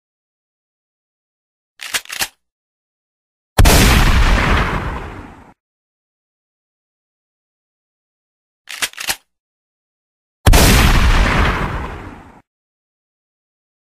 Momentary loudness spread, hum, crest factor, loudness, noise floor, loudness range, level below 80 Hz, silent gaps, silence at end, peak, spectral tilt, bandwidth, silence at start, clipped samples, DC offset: 20 LU; none; 18 dB; -15 LUFS; -35 dBFS; 12 LU; -20 dBFS; 2.51-3.56 s, 5.60-8.65 s, 9.40-10.44 s; 1.75 s; 0 dBFS; -4 dB/octave; 15.5 kHz; 1.8 s; under 0.1%; under 0.1%